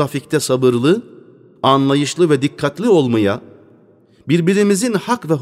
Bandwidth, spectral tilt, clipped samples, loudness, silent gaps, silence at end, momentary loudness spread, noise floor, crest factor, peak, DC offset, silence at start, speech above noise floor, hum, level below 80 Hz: 15.5 kHz; -5.5 dB/octave; under 0.1%; -16 LUFS; none; 0 s; 6 LU; -50 dBFS; 16 dB; 0 dBFS; under 0.1%; 0 s; 35 dB; none; -60 dBFS